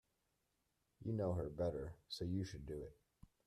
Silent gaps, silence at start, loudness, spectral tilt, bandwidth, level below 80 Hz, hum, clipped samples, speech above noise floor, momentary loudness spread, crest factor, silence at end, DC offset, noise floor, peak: none; 1 s; -45 LUFS; -7 dB/octave; 13 kHz; -62 dBFS; none; under 0.1%; 42 dB; 10 LU; 16 dB; 0.2 s; under 0.1%; -85 dBFS; -30 dBFS